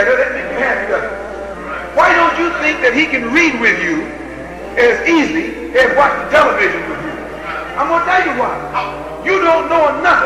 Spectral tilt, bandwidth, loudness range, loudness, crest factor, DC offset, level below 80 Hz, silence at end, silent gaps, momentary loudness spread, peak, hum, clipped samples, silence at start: -4 dB/octave; 13.5 kHz; 2 LU; -13 LUFS; 14 dB; 0.2%; -40 dBFS; 0 s; none; 14 LU; 0 dBFS; none; under 0.1%; 0 s